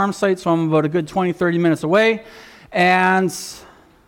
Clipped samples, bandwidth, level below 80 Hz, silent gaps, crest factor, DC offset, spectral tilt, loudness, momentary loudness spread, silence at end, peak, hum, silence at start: under 0.1%; 17 kHz; -56 dBFS; none; 12 dB; under 0.1%; -5.5 dB/octave; -18 LUFS; 10 LU; 0.5 s; -6 dBFS; none; 0 s